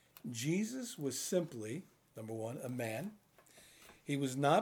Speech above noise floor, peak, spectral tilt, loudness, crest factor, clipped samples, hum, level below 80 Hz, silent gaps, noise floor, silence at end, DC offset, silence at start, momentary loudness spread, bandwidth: 26 dB; -18 dBFS; -5 dB/octave; -39 LUFS; 22 dB; under 0.1%; none; -82 dBFS; none; -63 dBFS; 0 s; under 0.1%; 0.25 s; 17 LU; over 20 kHz